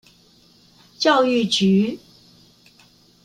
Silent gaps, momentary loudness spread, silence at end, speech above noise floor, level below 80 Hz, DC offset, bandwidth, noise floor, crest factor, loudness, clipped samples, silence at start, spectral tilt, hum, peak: none; 8 LU; 1.25 s; 37 dB; -64 dBFS; under 0.1%; 10.5 kHz; -54 dBFS; 18 dB; -18 LUFS; under 0.1%; 1 s; -5 dB/octave; none; -4 dBFS